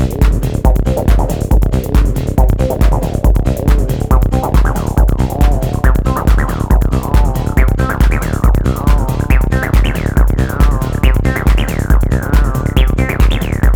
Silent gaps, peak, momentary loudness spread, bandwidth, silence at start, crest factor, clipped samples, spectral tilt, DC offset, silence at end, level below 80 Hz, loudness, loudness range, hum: none; 0 dBFS; 1 LU; 18 kHz; 0 s; 10 dB; under 0.1%; -7 dB/octave; under 0.1%; 0 s; -12 dBFS; -14 LUFS; 0 LU; none